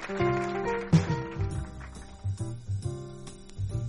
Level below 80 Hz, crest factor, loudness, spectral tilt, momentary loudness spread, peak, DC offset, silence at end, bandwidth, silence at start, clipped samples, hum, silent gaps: -44 dBFS; 20 dB; -31 LUFS; -7 dB/octave; 18 LU; -10 dBFS; under 0.1%; 0 s; 11.5 kHz; 0 s; under 0.1%; none; none